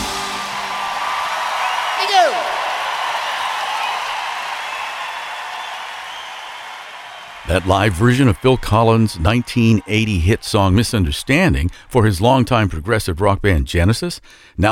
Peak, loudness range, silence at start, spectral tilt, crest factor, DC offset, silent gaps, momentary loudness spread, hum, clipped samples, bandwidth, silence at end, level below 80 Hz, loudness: 0 dBFS; 8 LU; 0 s; -5.5 dB/octave; 16 dB; under 0.1%; none; 14 LU; none; under 0.1%; 16 kHz; 0 s; -32 dBFS; -17 LUFS